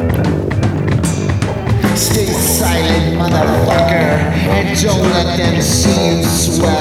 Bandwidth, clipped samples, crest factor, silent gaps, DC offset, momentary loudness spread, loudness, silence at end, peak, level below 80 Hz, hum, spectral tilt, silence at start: 17 kHz; under 0.1%; 12 dB; none; under 0.1%; 4 LU; -13 LUFS; 0 s; 0 dBFS; -26 dBFS; none; -5 dB/octave; 0 s